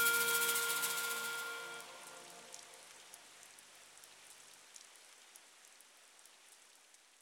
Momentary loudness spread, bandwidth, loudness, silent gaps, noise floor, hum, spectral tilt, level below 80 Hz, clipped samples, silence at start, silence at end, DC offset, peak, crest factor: 27 LU; 17.5 kHz; -36 LUFS; none; -65 dBFS; none; 1 dB/octave; under -90 dBFS; under 0.1%; 0 s; 0.65 s; under 0.1%; -18 dBFS; 24 dB